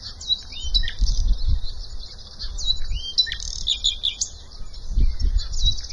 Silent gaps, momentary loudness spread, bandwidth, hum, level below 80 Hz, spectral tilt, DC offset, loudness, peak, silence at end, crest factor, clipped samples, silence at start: none; 16 LU; 8.2 kHz; none; -24 dBFS; -1.5 dB/octave; under 0.1%; -24 LUFS; -6 dBFS; 0 s; 16 dB; under 0.1%; 0 s